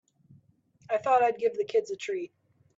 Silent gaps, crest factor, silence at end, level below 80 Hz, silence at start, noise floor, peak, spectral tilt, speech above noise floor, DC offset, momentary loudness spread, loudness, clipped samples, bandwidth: none; 18 dB; 0.5 s; -80 dBFS; 0.9 s; -63 dBFS; -12 dBFS; -4 dB/octave; 36 dB; under 0.1%; 12 LU; -28 LUFS; under 0.1%; 7.8 kHz